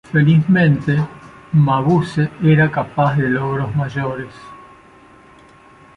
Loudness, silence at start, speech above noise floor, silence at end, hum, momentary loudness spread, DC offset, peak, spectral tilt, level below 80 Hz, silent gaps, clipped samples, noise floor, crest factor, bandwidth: -16 LUFS; 0.1 s; 30 dB; 1.35 s; none; 10 LU; under 0.1%; -4 dBFS; -9 dB/octave; -48 dBFS; none; under 0.1%; -45 dBFS; 14 dB; 6 kHz